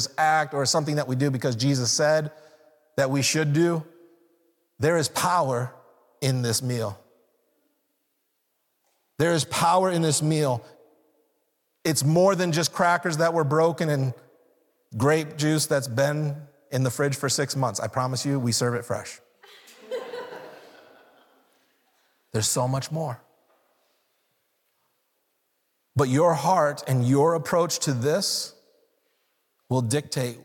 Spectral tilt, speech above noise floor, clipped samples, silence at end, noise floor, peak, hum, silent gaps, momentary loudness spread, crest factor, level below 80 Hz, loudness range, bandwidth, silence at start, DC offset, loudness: -4.5 dB/octave; 51 dB; under 0.1%; 0.05 s; -75 dBFS; -10 dBFS; none; none; 12 LU; 16 dB; -68 dBFS; 8 LU; 18 kHz; 0 s; under 0.1%; -24 LUFS